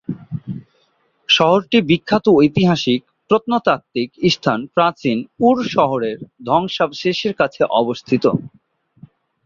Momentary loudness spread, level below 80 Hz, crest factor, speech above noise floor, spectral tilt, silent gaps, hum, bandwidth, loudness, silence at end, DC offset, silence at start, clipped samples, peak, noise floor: 12 LU; -54 dBFS; 16 dB; 45 dB; -6 dB/octave; none; none; 7.4 kHz; -17 LUFS; 1 s; under 0.1%; 0.1 s; under 0.1%; -2 dBFS; -62 dBFS